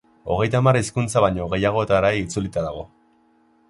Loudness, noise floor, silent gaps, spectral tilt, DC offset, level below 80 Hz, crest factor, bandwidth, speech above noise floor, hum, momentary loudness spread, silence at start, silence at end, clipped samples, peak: -21 LUFS; -59 dBFS; none; -6 dB/octave; under 0.1%; -44 dBFS; 18 dB; 11.5 kHz; 39 dB; none; 10 LU; 0.25 s; 0.85 s; under 0.1%; -4 dBFS